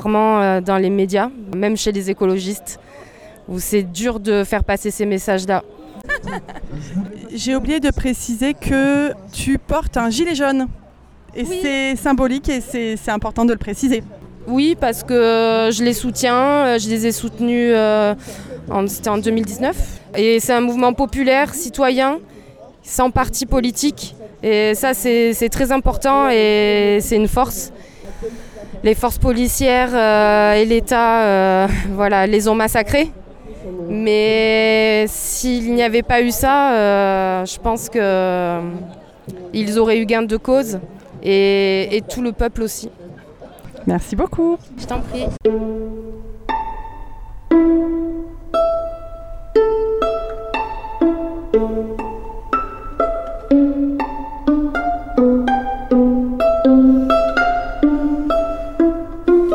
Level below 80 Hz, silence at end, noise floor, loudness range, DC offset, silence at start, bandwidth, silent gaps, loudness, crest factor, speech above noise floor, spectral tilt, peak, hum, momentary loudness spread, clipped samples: -32 dBFS; 0 s; -44 dBFS; 6 LU; under 0.1%; 0 s; 19 kHz; none; -17 LUFS; 14 dB; 27 dB; -4.5 dB/octave; -4 dBFS; none; 14 LU; under 0.1%